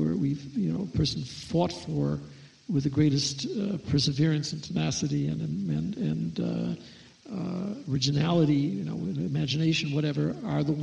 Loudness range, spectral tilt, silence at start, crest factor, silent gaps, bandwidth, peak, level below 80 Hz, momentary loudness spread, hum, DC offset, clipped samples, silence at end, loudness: 3 LU; -6 dB/octave; 0 s; 18 dB; none; 9.8 kHz; -10 dBFS; -54 dBFS; 8 LU; none; under 0.1%; under 0.1%; 0 s; -28 LUFS